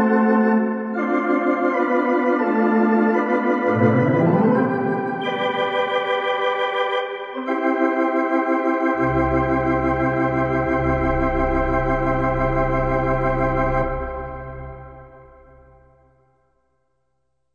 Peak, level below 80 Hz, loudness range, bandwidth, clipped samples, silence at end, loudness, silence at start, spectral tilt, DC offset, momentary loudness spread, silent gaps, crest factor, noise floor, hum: -6 dBFS; -34 dBFS; 6 LU; 7 kHz; under 0.1%; 2.3 s; -20 LUFS; 0 s; -8.5 dB/octave; under 0.1%; 7 LU; none; 16 dB; -74 dBFS; none